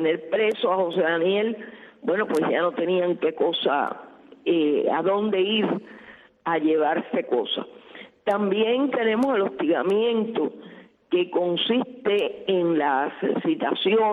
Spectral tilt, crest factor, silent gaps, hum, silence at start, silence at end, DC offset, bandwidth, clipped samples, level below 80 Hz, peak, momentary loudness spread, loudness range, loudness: -6.5 dB/octave; 14 dB; none; none; 0 s; 0 s; under 0.1%; 10 kHz; under 0.1%; -72 dBFS; -10 dBFS; 8 LU; 1 LU; -24 LUFS